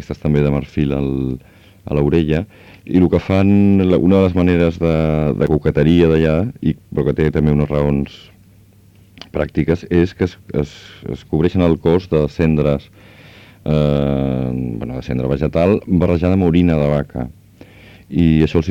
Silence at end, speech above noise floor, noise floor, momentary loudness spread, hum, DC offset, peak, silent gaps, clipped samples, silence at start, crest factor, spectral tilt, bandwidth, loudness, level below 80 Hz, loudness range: 0 s; 32 dB; -47 dBFS; 11 LU; none; under 0.1%; 0 dBFS; none; under 0.1%; 0 s; 16 dB; -9 dB/octave; 7.6 kHz; -16 LUFS; -32 dBFS; 5 LU